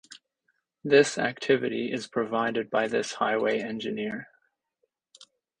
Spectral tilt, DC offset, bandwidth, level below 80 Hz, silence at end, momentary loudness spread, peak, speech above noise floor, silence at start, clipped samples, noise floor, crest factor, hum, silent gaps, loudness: -4 dB/octave; under 0.1%; 10 kHz; -70 dBFS; 0.35 s; 11 LU; -6 dBFS; 51 dB; 0.1 s; under 0.1%; -77 dBFS; 22 dB; none; none; -27 LUFS